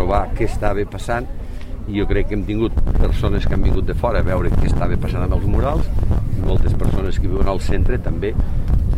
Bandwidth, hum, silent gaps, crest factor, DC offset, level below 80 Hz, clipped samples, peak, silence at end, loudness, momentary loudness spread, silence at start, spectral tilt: 9.4 kHz; none; none; 12 dB; under 0.1%; -18 dBFS; under 0.1%; -2 dBFS; 0 s; -21 LUFS; 4 LU; 0 s; -8 dB/octave